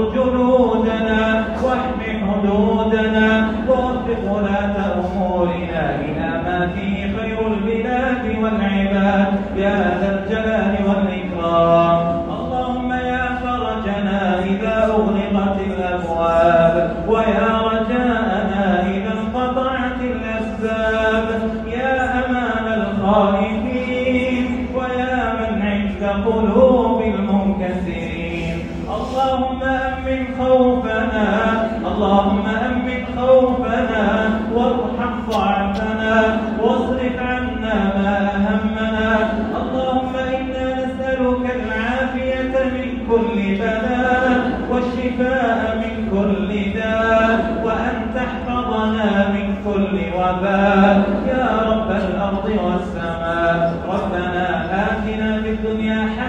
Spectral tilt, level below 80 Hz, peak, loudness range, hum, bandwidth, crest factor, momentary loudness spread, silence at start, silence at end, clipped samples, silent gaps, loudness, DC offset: -7.5 dB/octave; -34 dBFS; -2 dBFS; 3 LU; none; 8 kHz; 16 dB; 7 LU; 0 s; 0 s; under 0.1%; none; -18 LUFS; under 0.1%